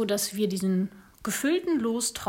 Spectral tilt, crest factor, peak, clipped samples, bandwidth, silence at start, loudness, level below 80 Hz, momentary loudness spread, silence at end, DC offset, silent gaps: -4 dB/octave; 12 dB; -14 dBFS; under 0.1%; 16.5 kHz; 0 s; -28 LUFS; -62 dBFS; 7 LU; 0 s; under 0.1%; none